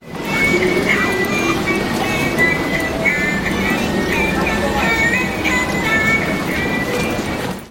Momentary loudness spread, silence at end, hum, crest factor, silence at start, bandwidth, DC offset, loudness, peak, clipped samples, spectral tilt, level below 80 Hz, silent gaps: 5 LU; 0 s; none; 16 dB; 0 s; 16.5 kHz; under 0.1%; -16 LUFS; -2 dBFS; under 0.1%; -4.5 dB/octave; -34 dBFS; none